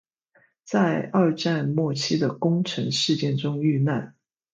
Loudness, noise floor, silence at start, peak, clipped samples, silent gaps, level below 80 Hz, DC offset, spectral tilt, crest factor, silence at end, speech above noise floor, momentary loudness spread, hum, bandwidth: -24 LUFS; -63 dBFS; 0.65 s; -8 dBFS; under 0.1%; none; -68 dBFS; under 0.1%; -6 dB/octave; 16 dB; 0.45 s; 40 dB; 3 LU; none; 9.2 kHz